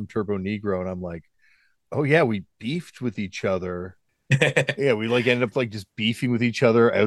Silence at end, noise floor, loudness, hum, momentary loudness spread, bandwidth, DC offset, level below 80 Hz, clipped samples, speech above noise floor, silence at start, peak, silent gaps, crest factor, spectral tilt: 0 s; -63 dBFS; -23 LUFS; none; 12 LU; 12.5 kHz; under 0.1%; -60 dBFS; under 0.1%; 40 dB; 0 s; -4 dBFS; none; 20 dB; -6 dB/octave